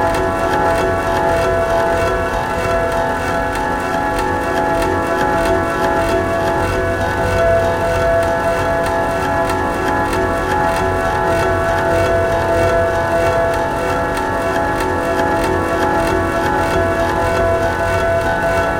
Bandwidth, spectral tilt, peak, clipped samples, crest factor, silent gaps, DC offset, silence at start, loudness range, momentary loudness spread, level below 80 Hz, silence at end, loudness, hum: 17 kHz; -5.5 dB/octave; -2 dBFS; under 0.1%; 14 dB; none; 0.4%; 0 s; 1 LU; 3 LU; -30 dBFS; 0 s; -16 LUFS; none